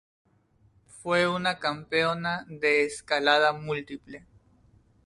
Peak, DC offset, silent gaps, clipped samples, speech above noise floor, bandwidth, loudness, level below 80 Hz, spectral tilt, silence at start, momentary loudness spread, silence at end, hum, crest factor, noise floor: -8 dBFS; under 0.1%; none; under 0.1%; 37 dB; 11.5 kHz; -26 LUFS; -64 dBFS; -4 dB/octave; 0.95 s; 18 LU; 0.9 s; none; 20 dB; -64 dBFS